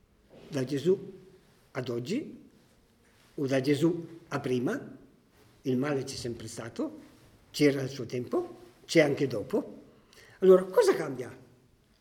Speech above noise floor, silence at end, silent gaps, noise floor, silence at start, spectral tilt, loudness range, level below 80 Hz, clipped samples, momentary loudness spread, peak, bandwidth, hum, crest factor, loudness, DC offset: 35 dB; 0.65 s; none; -63 dBFS; 0.35 s; -6 dB/octave; 7 LU; -68 dBFS; under 0.1%; 16 LU; -8 dBFS; 17 kHz; none; 22 dB; -29 LUFS; under 0.1%